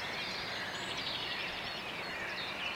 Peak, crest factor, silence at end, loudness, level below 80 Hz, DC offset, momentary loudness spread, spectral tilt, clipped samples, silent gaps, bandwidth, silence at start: -26 dBFS; 14 dB; 0 s; -37 LUFS; -64 dBFS; under 0.1%; 3 LU; -2.5 dB/octave; under 0.1%; none; 16 kHz; 0 s